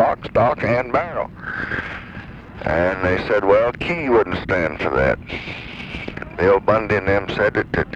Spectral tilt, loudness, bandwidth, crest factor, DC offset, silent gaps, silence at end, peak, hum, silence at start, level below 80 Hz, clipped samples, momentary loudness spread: -7.5 dB/octave; -19 LUFS; 8 kHz; 16 dB; under 0.1%; none; 0 s; -4 dBFS; none; 0 s; -40 dBFS; under 0.1%; 14 LU